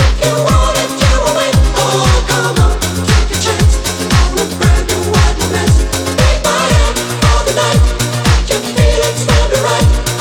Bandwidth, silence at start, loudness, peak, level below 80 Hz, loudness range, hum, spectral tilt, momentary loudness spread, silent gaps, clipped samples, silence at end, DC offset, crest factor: 19 kHz; 0 s; -12 LUFS; 0 dBFS; -14 dBFS; 1 LU; none; -4.5 dB/octave; 3 LU; none; under 0.1%; 0 s; under 0.1%; 10 dB